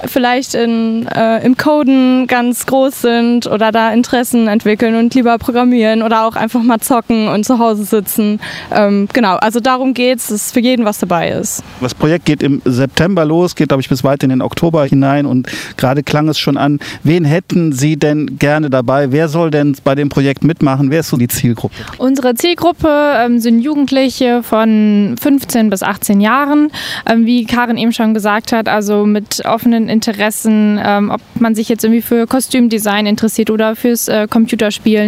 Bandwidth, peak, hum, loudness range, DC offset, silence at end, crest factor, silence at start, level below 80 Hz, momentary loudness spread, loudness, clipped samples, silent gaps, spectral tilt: 16 kHz; 0 dBFS; none; 2 LU; under 0.1%; 0 s; 10 dB; 0 s; -44 dBFS; 4 LU; -12 LUFS; under 0.1%; none; -5.5 dB/octave